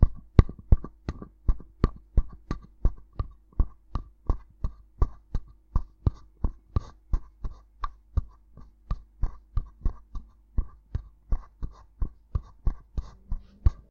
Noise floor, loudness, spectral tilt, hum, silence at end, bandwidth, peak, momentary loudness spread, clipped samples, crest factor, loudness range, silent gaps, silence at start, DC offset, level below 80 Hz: -50 dBFS; -33 LUFS; -9.5 dB/octave; none; 0.2 s; 5 kHz; 0 dBFS; 13 LU; under 0.1%; 28 dB; 6 LU; none; 0 s; under 0.1%; -30 dBFS